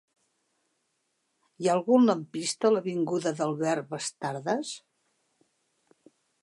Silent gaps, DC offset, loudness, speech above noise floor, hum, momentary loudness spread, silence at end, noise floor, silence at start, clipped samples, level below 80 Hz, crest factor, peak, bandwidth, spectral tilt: none; under 0.1%; -27 LUFS; 50 dB; none; 11 LU; 1.65 s; -77 dBFS; 1.6 s; under 0.1%; -82 dBFS; 20 dB; -10 dBFS; 11.5 kHz; -5 dB/octave